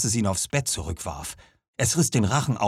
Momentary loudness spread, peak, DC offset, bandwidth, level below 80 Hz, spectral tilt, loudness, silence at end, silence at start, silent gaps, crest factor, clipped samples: 15 LU; -8 dBFS; under 0.1%; 15.5 kHz; -46 dBFS; -4 dB/octave; -24 LUFS; 0 s; 0 s; 1.68-1.73 s; 16 dB; under 0.1%